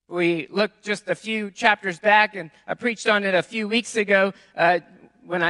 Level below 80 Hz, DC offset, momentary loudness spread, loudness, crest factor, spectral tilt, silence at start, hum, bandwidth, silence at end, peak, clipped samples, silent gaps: -70 dBFS; under 0.1%; 9 LU; -22 LUFS; 22 dB; -4 dB/octave; 0.1 s; none; 11.5 kHz; 0 s; 0 dBFS; under 0.1%; none